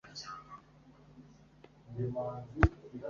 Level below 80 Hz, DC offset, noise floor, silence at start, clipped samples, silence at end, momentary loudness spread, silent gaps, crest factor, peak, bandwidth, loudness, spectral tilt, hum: -44 dBFS; under 0.1%; -60 dBFS; 0.05 s; under 0.1%; 0 s; 26 LU; none; 32 dB; -6 dBFS; 7.2 kHz; -35 LUFS; -6 dB/octave; none